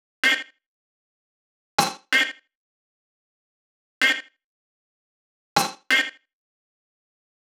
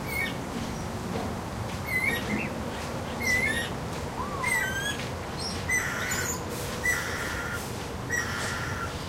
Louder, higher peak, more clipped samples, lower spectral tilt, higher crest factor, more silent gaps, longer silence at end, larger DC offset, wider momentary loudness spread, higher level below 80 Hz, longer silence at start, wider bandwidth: first, -22 LUFS vs -29 LUFS; first, 0 dBFS vs -16 dBFS; neither; second, -1 dB/octave vs -3.5 dB/octave; first, 28 dB vs 16 dB; first, 0.66-1.78 s, 2.55-4.01 s, 4.44-5.56 s vs none; first, 1.45 s vs 0 s; neither; about the same, 7 LU vs 8 LU; second, -70 dBFS vs -44 dBFS; first, 0.25 s vs 0 s; first, over 20 kHz vs 16 kHz